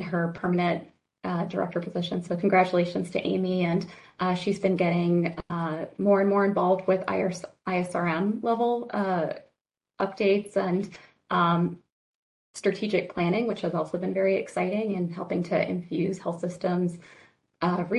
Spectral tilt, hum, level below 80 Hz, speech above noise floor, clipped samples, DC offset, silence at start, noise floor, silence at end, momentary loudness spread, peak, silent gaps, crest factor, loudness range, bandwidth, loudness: -7 dB/octave; none; -64 dBFS; 51 dB; under 0.1%; under 0.1%; 0 s; -77 dBFS; 0 s; 8 LU; -10 dBFS; 11.92-12.54 s; 16 dB; 3 LU; 11.5 kHz; -27 LUFS